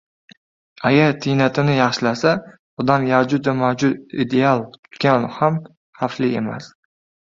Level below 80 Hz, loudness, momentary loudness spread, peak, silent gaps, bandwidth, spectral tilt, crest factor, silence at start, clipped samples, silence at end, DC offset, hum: -58 dBFS; -19 LUFS; 10 LU; -2 dBFS; 2.59-2.77 s, 4.79-4.83 s, 5.77-5.93 s; 7.6 kHz; -6.5 dB/octave; 18 dB; 0.8 s; under 0.1%; 0.6 s; under 0.1%; none